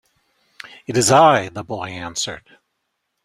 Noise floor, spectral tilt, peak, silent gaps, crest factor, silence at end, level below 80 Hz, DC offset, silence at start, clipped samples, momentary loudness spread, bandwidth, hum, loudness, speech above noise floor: -74 dBFS; -3.5 dB/octave; 0 dBFS; none; 20 dB; 0.85 s; -56 dBFS; under 0.1%; 0.9 s; under 0.1%; 23 LU; 15.5 kHz; none; -18 LUFS; 57 dB